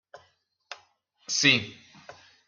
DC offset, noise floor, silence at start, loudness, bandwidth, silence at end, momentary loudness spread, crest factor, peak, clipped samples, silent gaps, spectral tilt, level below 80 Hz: under 0.1%; -68 dBFS; 0.15 s; -23 LUFS; 13 kHz; 0.35 s; 25 LU; 26 dB; -6 dBFS; under 0.1%; none; -2 dB/octave; -72 dBFS